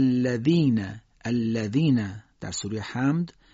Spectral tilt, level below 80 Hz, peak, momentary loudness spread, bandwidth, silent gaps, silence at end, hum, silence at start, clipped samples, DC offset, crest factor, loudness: -7 dB/octave; -60 dBFS; -10 dBFS; 13 LU; 7.8 kHz; none; 0.25 s; none; 0 s; under 0.1%; under 0.1%; 14 dB; -25 LUFS